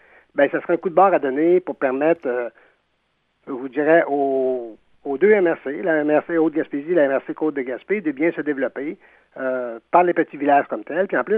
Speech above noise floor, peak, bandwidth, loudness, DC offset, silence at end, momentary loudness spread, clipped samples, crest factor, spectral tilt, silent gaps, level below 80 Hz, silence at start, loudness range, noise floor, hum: 49 dB; -2 dBFS; 4 kHz; -20 LUFS; under 0.1%; 0 s; 12 LU; under 0.1%; 18 dB; -9.5 dB/octave; none; -70 dBFS; 0.35 s; 3 LU; -68 dBFS; none